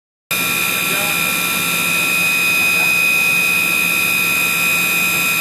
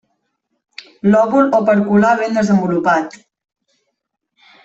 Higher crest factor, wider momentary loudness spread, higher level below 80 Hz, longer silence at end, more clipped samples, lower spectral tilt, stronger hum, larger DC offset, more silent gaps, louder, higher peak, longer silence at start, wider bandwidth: about the same, 10 dB vs 14 dB; about the same, 3 LU vs 5 LU; about the same, -56 dBFS vs -58 dBFS; second, 0 s vs 1.55 s; neither; second, -1 dB/octave vs -7 dB/octave; neither; neither; neither; about the same, -13 LUFS vs -14 LUFS; second, -6 dBFS vs -2 dBFS; second, 0.3 s vs 1.05 s; first, 14 kHz vs 7.8 kHz